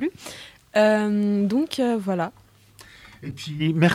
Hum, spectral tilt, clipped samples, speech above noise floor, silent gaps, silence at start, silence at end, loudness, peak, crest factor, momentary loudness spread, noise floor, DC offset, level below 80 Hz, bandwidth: none; -6.5 dB/octave; under 0.1%; 29 dB; none; 0 s; 0 s; -23 LUFS; -6 dBFS; 18 dB; 19 LU; -50 dBFS; under 0.1%; -60 dBFS; 14.5 kHz